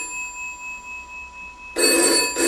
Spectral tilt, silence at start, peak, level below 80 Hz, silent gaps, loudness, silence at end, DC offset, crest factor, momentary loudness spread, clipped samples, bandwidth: 0 dB/octave; 0 s; -4 dBFS; -52 dBFS; none; -19 LUFS; 0 s; under 0.1%; 20 dB; 19 LU; under 0.1%; 16 kHz